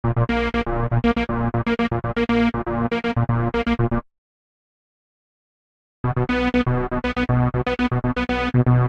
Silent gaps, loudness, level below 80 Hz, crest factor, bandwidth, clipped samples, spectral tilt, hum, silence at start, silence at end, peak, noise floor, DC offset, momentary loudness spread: 4.18-6.04 s; -21 LUFS; -34 dBFS; 16 dB; 7 kHz; under 0.1%; -8.5 dB/octave; none; 0.05 s; 0 s; -6 dBFS; under -90 dBFS; under 0.1%; 4 LU